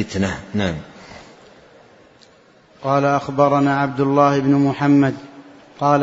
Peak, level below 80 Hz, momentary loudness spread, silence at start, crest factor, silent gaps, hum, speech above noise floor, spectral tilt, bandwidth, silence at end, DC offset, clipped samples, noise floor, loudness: 0 dBFS; -52 dBFS; 14 LU; 0 s; 18 dB; none; none; 34 dB; -7 dB/octave; 7.8 kHz; 0 s; under 0.1%; under 0.1%; -51 dBFS; -18 LUFS